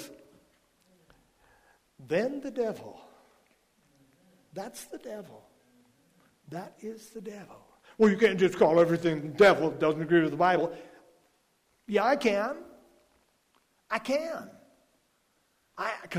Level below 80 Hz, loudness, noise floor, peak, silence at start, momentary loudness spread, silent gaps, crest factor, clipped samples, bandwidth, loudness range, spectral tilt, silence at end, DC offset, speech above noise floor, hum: -68 dBFS; -26 LUFS; -71 dBFS; -10 dBFS; 0 s; 21 LU; none; 20 dB; under 0.1%; 15.5 kHz; 20 LU; -6 dB/octave; 0 s; under 0.1%; 44 dB; none